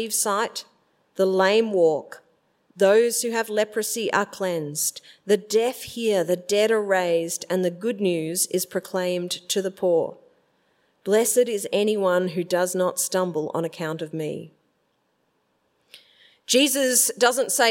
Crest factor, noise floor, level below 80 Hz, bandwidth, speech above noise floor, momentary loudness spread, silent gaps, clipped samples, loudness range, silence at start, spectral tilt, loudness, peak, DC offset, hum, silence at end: 20 dB; -70 dBFS; -76 dBFS; 16.5 kHz; 47 dB; 10 LU; none; under 0.1%; 5 LU; 0 s; -3 dB/octave; -23 LUFS; -4 dBFS; under 0.1%; none; 0 s